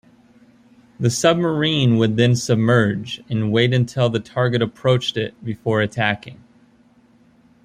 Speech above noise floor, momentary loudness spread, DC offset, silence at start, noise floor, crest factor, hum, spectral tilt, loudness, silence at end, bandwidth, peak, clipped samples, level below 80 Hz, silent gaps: 35 dB; 8 LU; under 0.1%; 1 s; -54 dBFS; 18 dB; none; -5.5 dB/octave; -19 LUFS; 1.3 s; 14 kHz; -2 dBFS; under 0.1%; -56 dBFS; none